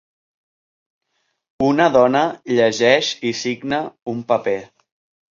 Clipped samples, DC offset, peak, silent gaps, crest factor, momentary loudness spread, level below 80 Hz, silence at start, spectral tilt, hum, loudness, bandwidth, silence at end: under 0.1%; under 0.1%; 0 dBFS; 4.02-4.06 s; 20 dB; 10 LU; -58 dBFS; 1.6 s; -4.5 dB/octave; none; -18 LUFS; 7.6 kHz; 0.65 s